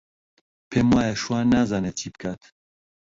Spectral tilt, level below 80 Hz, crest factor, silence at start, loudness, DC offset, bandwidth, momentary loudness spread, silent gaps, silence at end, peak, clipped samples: -5.5 dB/octave; -48 dBFS; 18 dB; 0.7 s; -23 LUFS; under 0.1%; 7.8 kHz; 14 LU; none; 0.7 s; -8 dBFS; under 0.1%